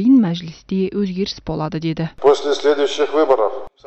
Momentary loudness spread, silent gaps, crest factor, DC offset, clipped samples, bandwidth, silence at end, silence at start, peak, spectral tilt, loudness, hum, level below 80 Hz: 9 LU; none; 14 dB; under 0.1%; under 0.1%; 8.4 kHz; 0 s; 0 s; -2 dBFS; -6.5 dB/octave; -18 LUFS; none; -46 dBFS